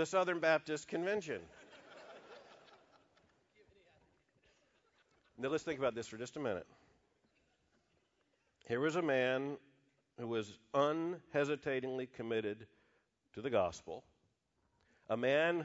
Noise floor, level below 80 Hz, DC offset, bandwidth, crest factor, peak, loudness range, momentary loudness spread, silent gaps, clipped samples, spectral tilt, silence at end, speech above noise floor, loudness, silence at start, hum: -80 dBFS; -78 dBFS; under 0.1%; 7.6 kHz; 22 dB; -18 dBFS; 8 LU; 22 LU; none; under 0.1%; -3.5 dB/octave; 0 s; 43 dB; -38 LUFS; 0 s; none